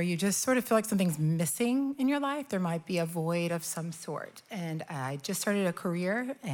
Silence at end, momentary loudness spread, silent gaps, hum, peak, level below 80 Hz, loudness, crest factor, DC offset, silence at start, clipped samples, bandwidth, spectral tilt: 0 s; 10 LU; none; none; -14 dBFS; -80 dBFS; -31 LUFS; 16 dB; under 0.1%; 0 s; under 0.1%; 19 kHz; -5 dB/octave